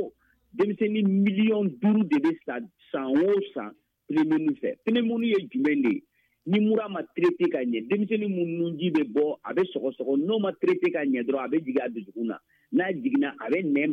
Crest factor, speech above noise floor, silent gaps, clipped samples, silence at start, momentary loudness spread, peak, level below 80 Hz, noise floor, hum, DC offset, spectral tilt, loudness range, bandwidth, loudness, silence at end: 14 dB; 21 dB; none; under 0.1%; 0 s; 10 LU; -12 dBFS; -76 dBFS; -47 dBFS; none; under 0.1%; -8.5 dB/octave; 2 LU; 5.8 kHz; -26 LUFS; 0 s